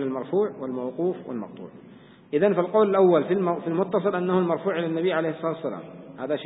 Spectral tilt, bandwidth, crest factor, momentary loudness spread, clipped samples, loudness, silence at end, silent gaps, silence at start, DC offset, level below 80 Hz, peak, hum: -11.5 dB/octave; 4 kHz; 18 dB; 16 LU; under 0.1%; -24 LUFS; 0 s; none; 0 s; under 0.1%; -72 dBFS; -8 dBFS; none